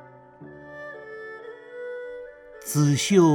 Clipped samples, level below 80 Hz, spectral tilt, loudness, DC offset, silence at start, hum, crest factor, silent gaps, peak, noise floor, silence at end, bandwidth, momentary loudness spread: under 0.1%; -66 dBFS; -5.5 dB/octave; -23 LUFS; under 0.1%; 0.4 s; none; 20 dB; none; -6 dBFS; -46 dBFS; 0 s; 18 kHz; 23 LU